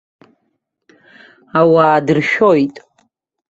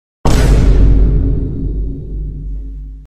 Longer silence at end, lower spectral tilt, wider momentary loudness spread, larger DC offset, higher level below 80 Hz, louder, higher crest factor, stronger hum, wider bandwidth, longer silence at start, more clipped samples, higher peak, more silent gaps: first, 0.7 s vs 0 s; about the same, -7 dB/octave vs -7 dB/octave; second, 8 LU vs 15 LU; neither; second, -60 dBFS vs -12 dBFS; about the same, -13 LUFS vs -15 LUFS; about the same, 14 dB vs 12 dB; neither; second, 7.8 kHz vs 11 kHz; first, 1.55 s vs 0.25 s; neither; about the same, -2 dBFS vs 0 dBFS; neither